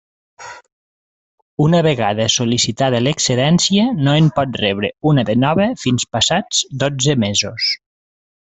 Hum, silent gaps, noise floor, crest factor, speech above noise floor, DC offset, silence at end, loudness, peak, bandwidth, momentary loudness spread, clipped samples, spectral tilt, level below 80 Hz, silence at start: none; 0.72-1.57 s; under -90 dBFS; 14 dB; over 75 dB; under 0.1%; 0.65 s; -16 LUFS; -2 dBFS; 8.4 kHz; 5 LU; under 0.1%; -4.5 dB/octave; -50 dBFS; 0.4 s